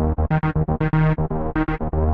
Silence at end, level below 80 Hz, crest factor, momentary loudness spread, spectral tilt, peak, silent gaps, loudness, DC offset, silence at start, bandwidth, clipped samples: 0 s; -28 dBFS; 12 dB; 4 LU; -11 dB/octave; -8 dBFS; none; -21 LUFS; under 0.1%; 0 s; 4.2 kHz; under 0.1%